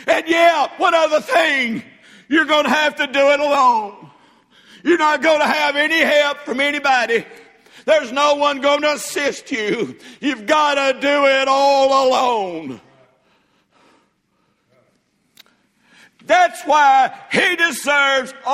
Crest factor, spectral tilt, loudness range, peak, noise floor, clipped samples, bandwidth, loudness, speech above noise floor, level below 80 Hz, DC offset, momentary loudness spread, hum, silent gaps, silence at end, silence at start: 16 dB; -2.5 dB/octave; 4 LU; 0 dBFS; -64 dBFS; under 0.1%; 16 kHz; -16 LUFS; 48 dB; -66 dBFS; under 0.1%; 9 LU; none; none; 0 s; 0 s